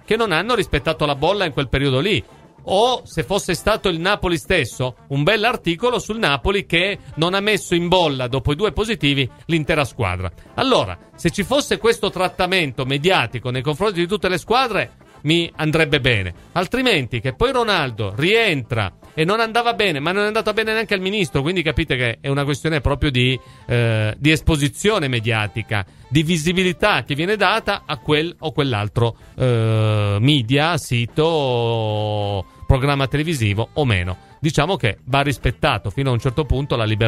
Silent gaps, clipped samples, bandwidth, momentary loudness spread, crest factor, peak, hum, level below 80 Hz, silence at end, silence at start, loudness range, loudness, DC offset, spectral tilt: none; under 0.1%; 15.5 kHz; 6 LU; 18 dB; 0 dBFS; none; -36 dBFS; 0 s; 0.1 s; 1 LU; -19 LUFS; under 0.1%; -5.5 dB/octave